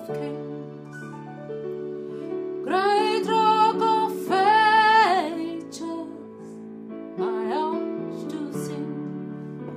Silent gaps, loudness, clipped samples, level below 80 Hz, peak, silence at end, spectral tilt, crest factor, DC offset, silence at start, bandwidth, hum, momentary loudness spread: none; -23 LUFS; under 0.1%; -74 dBFS; -6 dBFS; 0 s; -5 dB/octave; 18 dB; under 0.1%; 0 s; 15.5 kHz; none; 21 LU